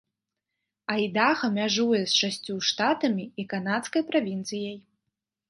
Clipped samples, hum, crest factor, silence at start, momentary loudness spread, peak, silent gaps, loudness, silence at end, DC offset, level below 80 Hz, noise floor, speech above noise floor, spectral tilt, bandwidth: under 0.1%; none; 20 dB; 0.9 s; 10 LU; -8 dBFS; none; -26 LUFS; 0.7 s; under 0.1%; -76 dBFS; -85 dBFS; 59 dB; -3.5 dB/octave; 11.5 kHz